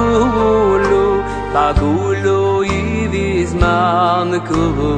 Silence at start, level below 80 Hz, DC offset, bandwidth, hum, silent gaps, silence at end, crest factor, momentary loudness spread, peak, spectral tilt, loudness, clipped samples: 0 s; -26 dBFS; under 0.1%; 9.4 kHz; none; none; 0 s; 14 dB; 4 LU; 0 dBFS; -6.5 dB/octave; -15 LUFS; under 0.1%